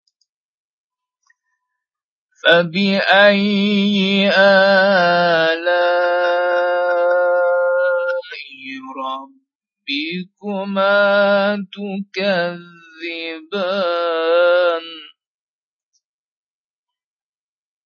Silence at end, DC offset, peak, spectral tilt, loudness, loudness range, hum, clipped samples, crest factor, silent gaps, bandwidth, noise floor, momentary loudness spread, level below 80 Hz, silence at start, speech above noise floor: 2.8 s; under 0.1%; 0 dBFS; -6 dB/octave; -16 LUFS; 8 LU; none; under 0.1%; 18 dB; 9.55-9.61 s; 7 kHz; under -90 dBFS; 16 LU; -72 dBFS; 2.45 s; over 74 dB